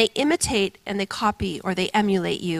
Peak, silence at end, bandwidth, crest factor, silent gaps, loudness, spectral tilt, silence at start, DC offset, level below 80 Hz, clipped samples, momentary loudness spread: -4 dBFS; 0 s; 15.5 kHz; 18 dB; none; -23 LUFS; -4 dB/octave; 0 s; under 0.1%; -46 dBFS; under 0.1%; 7 LU